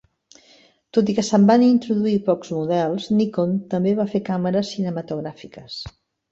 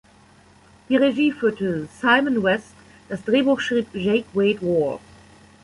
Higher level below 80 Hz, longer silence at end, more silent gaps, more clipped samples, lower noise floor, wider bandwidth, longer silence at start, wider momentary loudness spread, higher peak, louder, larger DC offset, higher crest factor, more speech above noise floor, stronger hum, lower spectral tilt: about the same, -58 dBFS vs -58 dBFS; second, 0.4 s vs 0.65 s; neither; neither; about the same, -54 dBFS vs -52 dBFS; second, 7.8 kHz vs 11.5 kHz; about the same, 0.95 s vs 0.9 s; first, 18 LU vs 8 LU; about the same, -4 dBFS vs -4 dBFS; about the same, -20 LUFS vs -21 LUFS; neither; about the same, 18 dB vs 18 dB; about the same, 35 dB vs 32 dB; neither; about the same, -7 dB/octave vs -6 dB/octave